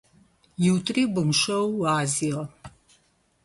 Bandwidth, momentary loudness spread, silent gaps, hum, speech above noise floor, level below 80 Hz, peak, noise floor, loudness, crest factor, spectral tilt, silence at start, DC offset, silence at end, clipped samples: 12 kHz; 10 LU; none; none; 41 dB; -60 dBFS; -10 dBFS; -65 dBFS; -24 LUFS; 16 dB; -4.5 dB/octave; 0.6 s; under 0.1%; 0.75 s; under 0.1%